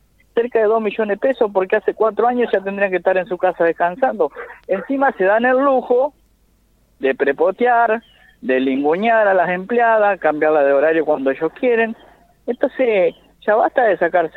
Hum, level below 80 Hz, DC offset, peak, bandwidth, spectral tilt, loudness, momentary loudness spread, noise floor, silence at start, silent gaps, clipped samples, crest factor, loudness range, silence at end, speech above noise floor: none; -58 dBFS; under 0.1%; -2 dBFS; 4.3 kHz; -7.5 dB/octave; -17 LUFS; 8 LU; -57 dBFS; 0.35 s; none; under 0.1%; 14 dB; 3 LU; 0.05 s; 41 dB